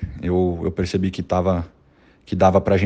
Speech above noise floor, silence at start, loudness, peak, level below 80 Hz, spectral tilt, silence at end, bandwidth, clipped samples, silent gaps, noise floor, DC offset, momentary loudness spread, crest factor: 35 dB; 0 s; -21 LUFS; -2 dBFS; -42 dBFS; -7.5 dB/octave; 0 s; 8.6 kHz; under 0.1%; none; -54 dBFS; under 0.1%; 9 LU; 18 dB